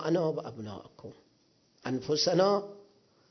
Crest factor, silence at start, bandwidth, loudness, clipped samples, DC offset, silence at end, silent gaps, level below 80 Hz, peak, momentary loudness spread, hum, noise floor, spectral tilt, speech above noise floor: 18 dB; 0 s; 6.4 kHz; -29 LUFS; under 0.1%; under 0.1%; 0.5 s; none; -70 dBFS; -14 dBFS; 24 LU; none; -68 dBFS; -5 dB/octave; 38 dB